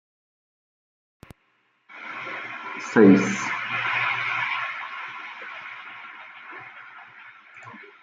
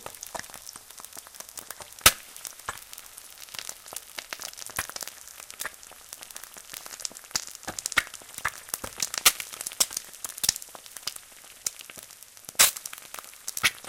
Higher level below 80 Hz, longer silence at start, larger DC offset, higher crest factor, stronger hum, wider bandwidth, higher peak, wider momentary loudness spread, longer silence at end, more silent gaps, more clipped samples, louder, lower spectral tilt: second, -70 dBFS vs -58 dBFS; first, 1.9 s vs 0 s; neither; second, 24 dB vs 32 dB; neither; second, 7.8 kHz vs 17 kHz; second, -4 dBFS vs 0 dBFS; first, 26 LU vs 22 LU; first, 0.15 s vs 0 s; neither; neither; first, -23 LUFS vs -28 LUFS; first, -5.5 dB/octave vs 1 dB/octave